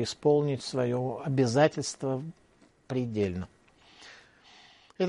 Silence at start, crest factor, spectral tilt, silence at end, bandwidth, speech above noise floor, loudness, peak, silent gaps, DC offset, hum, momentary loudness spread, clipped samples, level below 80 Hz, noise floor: 0 s; 22 dB; -6 dB/octave; 0 s; 11.5 kHz; 34 dB; -29 LUFS; -8 dBFS; none; under 0.1%; none; 20 LU; under 0.1%; -64 dBFS; -62 dBFS